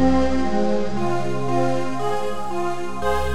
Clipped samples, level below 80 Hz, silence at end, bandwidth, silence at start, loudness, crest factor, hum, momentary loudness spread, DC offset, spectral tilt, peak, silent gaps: under 0.1%; -36 dBFS; 0 s; 14.5 kHz; 0 s; -23 LUFS; 14 dB; none; 5 LU; 8%; -6.5 dB/octave; -8 dBFS; none